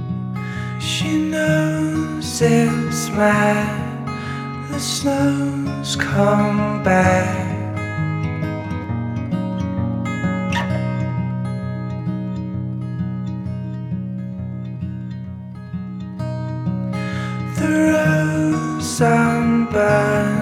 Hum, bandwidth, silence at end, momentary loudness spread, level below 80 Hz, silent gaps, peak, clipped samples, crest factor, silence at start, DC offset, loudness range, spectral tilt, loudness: none; 16 kHz; 0 s; 12 LU; -46 dBFS; none; -2 dBFS; under 0.1%; 18 dB; 0 s; under 0.1%; 9 LU; -6 dB/octave; -20 LUFS